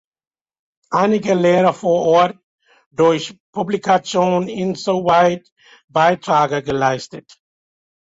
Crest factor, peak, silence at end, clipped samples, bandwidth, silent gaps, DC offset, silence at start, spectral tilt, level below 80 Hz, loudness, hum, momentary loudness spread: 16 dB; -2 dBFS; 1 s; under 0.1%; 8 kHz; 2.43-2.58 s, 2.86-2.91 s, 3.40-3.53 s, 5.52-5.56 s, 5.84-5.88 s; under 0.1%; 0.9 s; -5.5 dB/octave; -58 dBFS; -17 LUFS; none; 9 LU